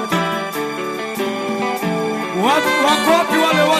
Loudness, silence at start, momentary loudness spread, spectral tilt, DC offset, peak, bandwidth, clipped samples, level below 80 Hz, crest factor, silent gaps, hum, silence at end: -17 LUFS; 0 s; 9 LU; -4 dB/octave; under 0.1%; -2 dBFS; 15 kHz; under 0.1%; -60 dBFS; 16 dB; none; none; 0 s